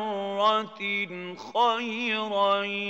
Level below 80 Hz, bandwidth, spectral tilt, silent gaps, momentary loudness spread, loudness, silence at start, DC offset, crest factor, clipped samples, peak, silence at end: -90 dBFS; 8.2 kHz; -4 dB/octave; none; 7 LU; -26 LUFS; 0 s; under 0.1%; 16 dB; under 0.1%; -10 dBFS; 0 s